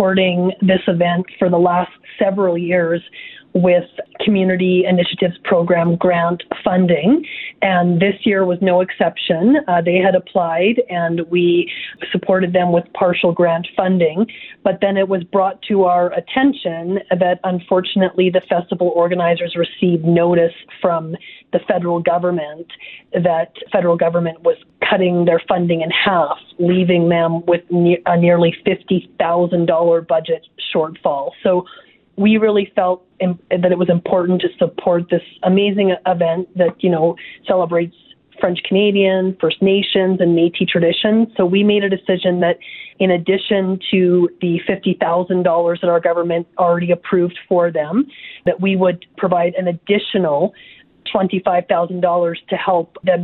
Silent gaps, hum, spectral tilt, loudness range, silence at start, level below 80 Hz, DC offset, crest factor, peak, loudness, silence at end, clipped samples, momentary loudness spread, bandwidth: none; none; -11 dB/octave; 3 LU; 0 s; -58 dBFS; under 0.1%; 16 dB; 0 dBFS; -16 LUFS; 0 s; under 0.1%; 7 LU; 4.2 kHz